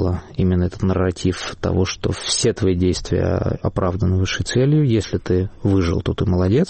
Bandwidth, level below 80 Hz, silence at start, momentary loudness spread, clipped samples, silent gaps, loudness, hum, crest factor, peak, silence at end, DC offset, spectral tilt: 8.8 kHz; -36 dBFS; 0 s; 5 LU; under 0.1%; none; -20 LUFS; none; 12 dB; -6 dBFS; 0 s; under 0.1%; -6 dB/octave